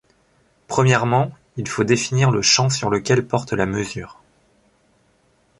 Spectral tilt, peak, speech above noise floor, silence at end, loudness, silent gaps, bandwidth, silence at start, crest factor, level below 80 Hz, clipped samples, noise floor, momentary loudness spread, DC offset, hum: -4.5 dB/octave; -2 dBFS; 42 dB; 1.5 s; -19 LUFS; none; 11.5 kHz; 0.7 s; 18 dB; -50 dBFS; under 0.1%; -61 dBFS; 13 LU; under 0.1%; none